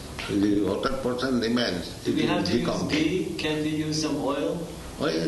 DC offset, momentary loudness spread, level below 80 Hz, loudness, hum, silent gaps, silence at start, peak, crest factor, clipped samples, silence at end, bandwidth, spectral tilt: under 0.1%; 5 LU; -46 dBFS; -26 LUFS; none; none; 0 s; -10 dBFS; 16 dB; under 0.1%; 0 s; 12 kHz; -5 dB/octave